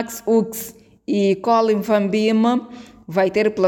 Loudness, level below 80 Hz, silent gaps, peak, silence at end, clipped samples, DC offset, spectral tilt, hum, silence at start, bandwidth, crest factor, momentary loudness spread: -19 LUFS; -60 dBFS; none; -4 dBFS; 0 s; under 0.1%; under 0.1%; -5.5 dB/octave; none; 0 s; over 20 kHz; 14 dB; 17 LU